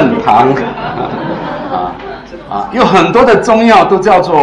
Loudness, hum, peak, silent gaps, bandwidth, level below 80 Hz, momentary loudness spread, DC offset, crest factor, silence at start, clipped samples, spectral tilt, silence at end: -10 LUFS; none; 0 dBFS; none; 11 kHz; -38 dBFS; 14 LU; under 0.1%; 10 dB; 0 s; under 0.1%; -6 dB/octave; 0 s